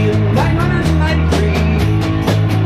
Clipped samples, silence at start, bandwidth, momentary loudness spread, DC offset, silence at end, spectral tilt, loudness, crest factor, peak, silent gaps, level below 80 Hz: under 0.1%; 0 s; 14 kHz; 1 LU; under 0.1%; 0 s; -7 dB/octave; -14 LUFS; 10 dB; -2 dBFS; none; -22 dBFS